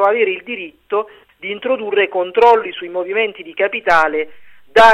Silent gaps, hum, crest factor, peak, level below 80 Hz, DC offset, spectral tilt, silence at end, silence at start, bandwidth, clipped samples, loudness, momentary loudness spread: none; none; 14 dB; 0 dBFS; -52 dBFS; under 0.1%; -3.5 dB/octave; 0 s; 0 s; 12 kHz; under 0.1%; -16 LUFS; 15 LU